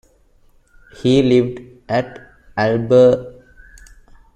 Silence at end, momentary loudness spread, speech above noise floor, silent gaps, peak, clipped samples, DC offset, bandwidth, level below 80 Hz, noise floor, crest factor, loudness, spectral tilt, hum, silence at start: 1.05 s; 19 LU; 38 dB; none; -2 dBFS; under 0.1%; under 0.1%; 10 kHz; -48 dBFS; -53 dBFS; 16 dB; -16 LUFS; -7 dB/octave; none; 1.05 s